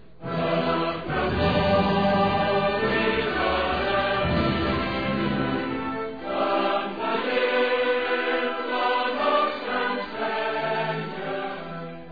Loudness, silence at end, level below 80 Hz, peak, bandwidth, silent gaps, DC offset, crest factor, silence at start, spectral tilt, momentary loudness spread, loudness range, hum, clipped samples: -24 LUFS; 0 s; -44 dBFS; -10 dBFS; 5 kHz; none; 0.5%; 14 dB; 0.2 s; -8 dB/octave; 8 LU; 3 LU; none; under 0.1%